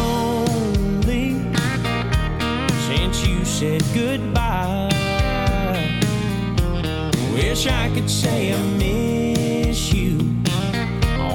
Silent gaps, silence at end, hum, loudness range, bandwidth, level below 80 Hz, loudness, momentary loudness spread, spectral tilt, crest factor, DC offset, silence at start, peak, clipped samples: none; 0 s; none; 1 LU; 19 kHz; -28 dBFS; -20 LUFS; 2 LU; -5.5 dB/octave; 14 dB; under 0.1%; 0 s; -6 dBFS; under 0.1%